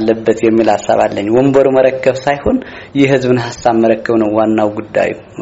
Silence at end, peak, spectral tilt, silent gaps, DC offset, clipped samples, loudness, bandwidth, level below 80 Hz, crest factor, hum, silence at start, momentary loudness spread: 0 s; 0 dBFS; -5.5 dB/octave; none; under 0.1%; under 0.1%; -12 LUFS; 8 kHz; -42 dBFS; 12 dB; none; 0 s; 6 LU